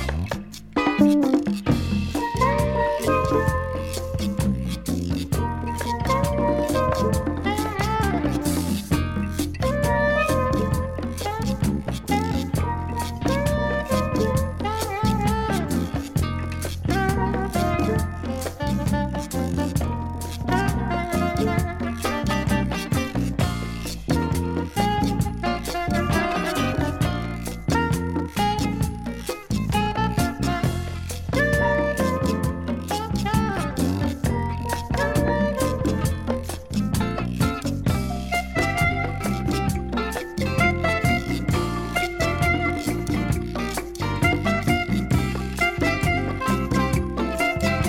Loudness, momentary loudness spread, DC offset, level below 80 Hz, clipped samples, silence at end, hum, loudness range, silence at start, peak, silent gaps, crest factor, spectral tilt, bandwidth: -24 LUFS; 6 LU; under 0.1%; -34 dBFS; under 0.1%; 0 s; none; 2 LU; 0 s; -4 dBFS; none; 18 dB; -6 dB/octave; 17 kHz